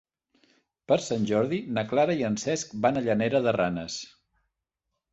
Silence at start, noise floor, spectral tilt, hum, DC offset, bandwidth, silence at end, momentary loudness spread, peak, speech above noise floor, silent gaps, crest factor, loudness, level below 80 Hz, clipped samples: 0.9 s; -84 dBFS; -5 dB/octave; none; under 0.1%; 8.2 kHz; 1.05 s; 8 LU; -8 dBFS; 58 dB; none; 20 dB; -27 LUFS; -62 dBFS; under 0.1%